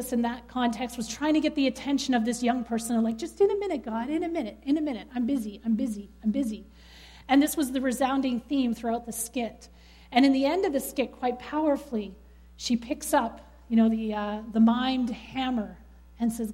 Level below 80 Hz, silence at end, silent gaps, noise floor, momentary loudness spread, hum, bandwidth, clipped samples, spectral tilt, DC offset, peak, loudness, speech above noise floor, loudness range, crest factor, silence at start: -54 dBFS; 0 s; none; -50 dBFS; 9 LU; none; 16 kHz; under 0.1%; -4.5 dB/octave; under 0.1%; -10 dBFS; -28 LUFS; 23 dB; 2 LU; 18 dB; 0 s